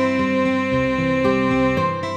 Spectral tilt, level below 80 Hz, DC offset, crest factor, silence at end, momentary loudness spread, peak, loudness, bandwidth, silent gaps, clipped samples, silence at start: -7 dB/octave; -42 dBFS; under 0.1%; 12 dB; 0 s; 2 LU; -6 dBFS; -19 LUFS; 8.8 kHz; none; under 0.1%; 0 s